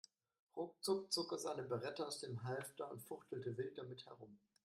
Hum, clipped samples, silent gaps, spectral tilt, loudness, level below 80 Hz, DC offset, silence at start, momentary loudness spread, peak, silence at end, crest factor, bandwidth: none; under 0.1%; none; -4.5 dB/octave; -46 LUFS; -86 dBFS; under 0.1%; 0.55 s; 15 LU; -28 dBFS; 0.3 s; 20 dB; 13.5 kHz